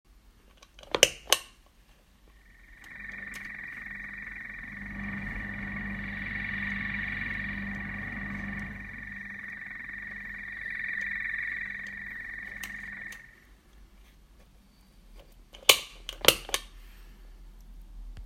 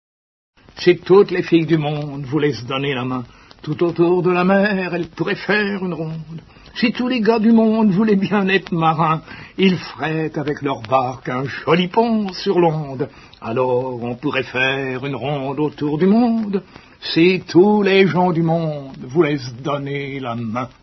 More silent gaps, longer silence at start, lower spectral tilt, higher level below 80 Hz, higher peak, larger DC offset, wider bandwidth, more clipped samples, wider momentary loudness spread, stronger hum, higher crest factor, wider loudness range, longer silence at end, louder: neither; second, 0.1 s vs 0.75 s; second, -1.5 dB/octave vs -7.5 dB/octave; about the same, -50 dBFS vs -54 dBFS; about the same, 0 dBFS vs 0 dBFS; neither; first, 16 kHz vs 6.2 kHz; neither; first, 16 LU vs 12 LU; neither; first, 34 dB vs 18 dB; first, 12 LU vs 3 LU; second, 0 s vs 0.15 s; second, -31 LUFS vs -18 LUFS